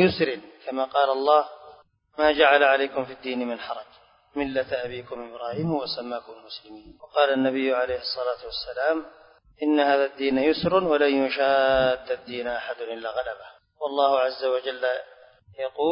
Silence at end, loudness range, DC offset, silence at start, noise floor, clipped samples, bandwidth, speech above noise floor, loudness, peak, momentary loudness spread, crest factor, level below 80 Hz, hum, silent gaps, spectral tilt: 0 s; 8 LU; under 0.1%; 0 s; -52 dBFS; under 0.1%; 5.4 kHz; 28 dB; -24 LUFS; -4 dBFS; 15 LU; 20 dB; -56 dBFS; none; none; -9 dB/octave